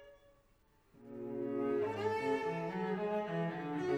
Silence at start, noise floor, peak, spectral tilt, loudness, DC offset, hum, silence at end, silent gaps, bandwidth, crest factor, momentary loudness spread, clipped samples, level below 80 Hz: 0 s; -70 dBFS; -24 dBFS; -7.5 dB/octave; -38 LUFS; under 0.1%; none; 0 s; none; 10 kHz; 14 dB; 7 LU; under 0.1%; -72 dBFS